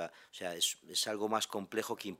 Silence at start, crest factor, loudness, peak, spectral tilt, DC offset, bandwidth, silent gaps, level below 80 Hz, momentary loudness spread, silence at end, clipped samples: 0 s; 20 dB; -36 LUFS; -18 dBFS; -1.5 dB/octave; under 0.1%; 16 kHz; none; -86 dBFS; 10 LU; 0.05 s; under 0.1%